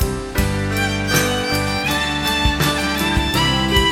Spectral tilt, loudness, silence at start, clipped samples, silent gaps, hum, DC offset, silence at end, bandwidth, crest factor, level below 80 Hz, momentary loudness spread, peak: -4 dB/octave; -18 LUFS; 0 s; under 0.1%; none; none; under 0.1%; 0 s; 17.5 kHz; 16 dB; -28 dBFS; 4 LU; -2 dBFS